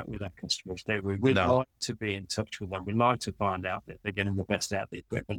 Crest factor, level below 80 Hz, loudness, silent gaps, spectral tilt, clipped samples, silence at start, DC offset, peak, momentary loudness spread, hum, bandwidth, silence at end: 20 dB; -58 dBFS; -30 LUFS; none; -5 dB/octave; under 0.1%; 0 s; under 0.1%; -10 dBFS; 10 LU; none; 17 kHz; 0 s